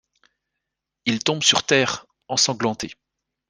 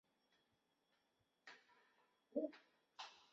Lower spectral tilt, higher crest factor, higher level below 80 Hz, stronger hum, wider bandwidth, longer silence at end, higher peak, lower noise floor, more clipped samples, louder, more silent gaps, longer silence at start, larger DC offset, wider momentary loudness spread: about the same, -2.5 dB/octave vs -2 dB/octave; about the same, 22 dB vs 26 dB; first, -62 dBFS vs under -90 dBFS; neither; first, 10.5 kHz vs 7.4 kHz; first, 0.55 s vs 0.1 s; first, -2 dBFS vs -30 dBFS; about the same, -82 dBFS vs -85 dBFS; neither; first, -20 LUFS vs -51 LUFS; neither; second, 1.05 s vs 1.45 s; neither; second, 14 LU vs 19 LU